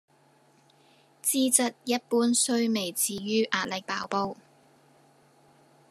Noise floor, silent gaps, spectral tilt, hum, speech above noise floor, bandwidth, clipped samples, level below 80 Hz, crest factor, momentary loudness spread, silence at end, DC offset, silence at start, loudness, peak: -62 dBFS; none; -2.5 dB/octave; none; 35 dB; 14 kHz; under 0.1%; -76 dBFS; 24 dB; 8 LU; 1.55 s; under 0.1%; 1.25 s; -26 LUFS; -6 dBFS